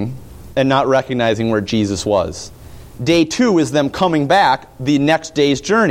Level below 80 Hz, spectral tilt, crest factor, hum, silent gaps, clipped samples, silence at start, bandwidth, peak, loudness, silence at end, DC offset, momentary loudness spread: -44 dBFS; -5 dB/octave; 14 dB; none; none; under 0.1%; 0 s; 16 kHz; -2 dBFS; -16 LUFS; 0 s; under 0.1%; 10 LU